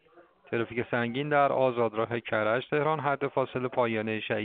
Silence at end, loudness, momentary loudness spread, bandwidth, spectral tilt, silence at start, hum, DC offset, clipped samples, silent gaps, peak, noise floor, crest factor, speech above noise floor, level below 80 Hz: 0 s; -28 LUFS; 6 LU; 4.6 kHz; -4.5 dB/octave; 0.15 s; none; under 0.1%; under 0.1%; none; -10 dBFS; -58 dBFS; 18 dB; 30 dB; -68 dBFS